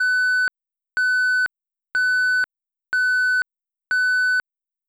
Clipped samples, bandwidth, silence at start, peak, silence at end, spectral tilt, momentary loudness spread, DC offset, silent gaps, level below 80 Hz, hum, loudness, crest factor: under 0.1%; over 20 kHz; 0 s; -14 dBFS; 0.5 s; 2.5 dB/octave; 8 LU; under 0.1%; none; -72 dBFS; none; -20 LUFS; 8 dB